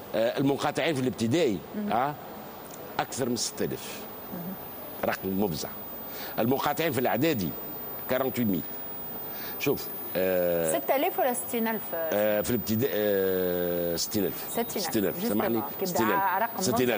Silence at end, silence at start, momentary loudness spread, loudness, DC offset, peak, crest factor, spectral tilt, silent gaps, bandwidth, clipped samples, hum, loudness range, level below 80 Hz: 0 s; 0 s; 10 LU; -28 LUFS; under 0.1%; -10 dBFS; 20 dB; -4.5 dB/octave; none; 15.5 kHz; under 0.1%; none; 5 LU; -62 dBFS